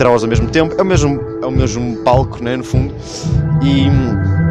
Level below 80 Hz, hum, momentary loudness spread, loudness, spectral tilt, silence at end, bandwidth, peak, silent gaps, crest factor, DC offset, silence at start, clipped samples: -26 dBFS; none; 6 LU; -15 LUFS; -6.5 dB/octave; 0 s; 10 kHz; 0 dBFS; none; 12 dB; under 0.1%; 0 s; under 0.1%